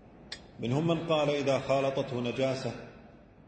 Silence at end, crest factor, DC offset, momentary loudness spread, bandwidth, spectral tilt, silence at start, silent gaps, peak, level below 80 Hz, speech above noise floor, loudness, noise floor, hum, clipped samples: 0.05 s; 16 dB; under 0.1%; 17 LU; 9.2 kHz; -6 dB/octave; 0.05 s; none; -14 dBFS; -60 dBFS; 24 dB; -30 LUFS; -54 dBFS; none; under 0.1%